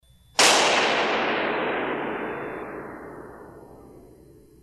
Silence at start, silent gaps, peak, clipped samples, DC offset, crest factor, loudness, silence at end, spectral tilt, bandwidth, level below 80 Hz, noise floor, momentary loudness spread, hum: 0.35 s; none; -6 dBFS; under 0.1%; under 0.1%; 20 dB; -22 LUFS; 0.6 s; -1 dB/octave; 14.5 kHz; -58 dBFS; -51 dBFS; 23 LU; none